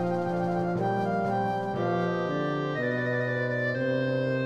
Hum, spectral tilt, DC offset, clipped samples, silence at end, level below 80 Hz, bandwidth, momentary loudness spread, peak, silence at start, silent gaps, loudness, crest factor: none; -8 dB/octave; under 0.1%; under 0.1%; 0 s; -62 dBFS; 8.8 kHz; 1 LU; -16 dBFS; 0 s; none; -28 LUFS; 12 dB